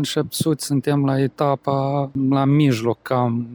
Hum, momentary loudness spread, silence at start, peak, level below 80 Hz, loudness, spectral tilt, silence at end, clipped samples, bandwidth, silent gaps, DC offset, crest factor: none; 5 LU; 0 s; -6 dBFS; -60 dBFS; -20 LUFS; -6.5 dB/octave; 0 s; under 0.1%; over 20 kHz; none; under 0.1%; 14 dB